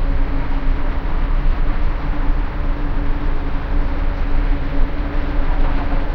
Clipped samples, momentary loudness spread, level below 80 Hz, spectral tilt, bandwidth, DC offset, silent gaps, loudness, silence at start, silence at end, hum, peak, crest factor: under 0.1%; 2 LU; -16 dBFS; -8.5 dB/octave; 4.8 kHz; under 0.1%; none; -24 LUFS; 0 s; 0 s; none; -4 dBFS; 12 dB